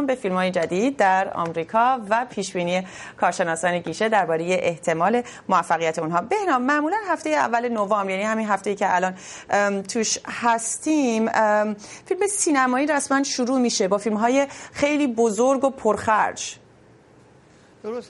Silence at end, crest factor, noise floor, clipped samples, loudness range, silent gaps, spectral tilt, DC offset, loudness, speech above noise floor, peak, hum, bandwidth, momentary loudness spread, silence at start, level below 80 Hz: 0.05 s; 16 dB; -52 dBFS; under 0.1%; 2 LU; none; -4 dB/octave; under 0.1%; -22 LUFS; 30 dB; -6 dBFS; none; 11.5 kHz; 6 LU; 0 s; -64 dBFS